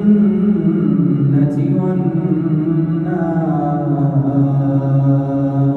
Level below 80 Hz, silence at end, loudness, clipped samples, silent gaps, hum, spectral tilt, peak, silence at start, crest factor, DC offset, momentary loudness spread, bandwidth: -46 dBFS; 0 s; -15 LUFS; under 0.1%; none; none; -12 dB/octave; -2 dBFS; 0 s; 12 dB; under 0.1%; 3 LU; 3.9 kHz